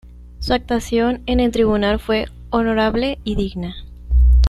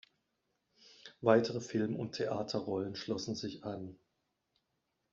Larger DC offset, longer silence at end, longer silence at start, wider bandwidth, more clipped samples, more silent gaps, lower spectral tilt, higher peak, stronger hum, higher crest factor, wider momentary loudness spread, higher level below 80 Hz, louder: neither; second, 0 s vs 1.2 s; second, 0.05 s vs 1.05 s; first, 12 kHz vs 7.6 kHz; neither; neither; first, -6.5 dB/octave vs -5 dB/octave; first, -2 dBFS vs -12 dBFS; first, 60 Hz at -35 dBFS vs none; second, 16 dB vs 26 dB; second, 9 LU vs 16 LU; first, -22 dBFS vs -76 dBFS; first, -19 LUFS vs -36 LUFS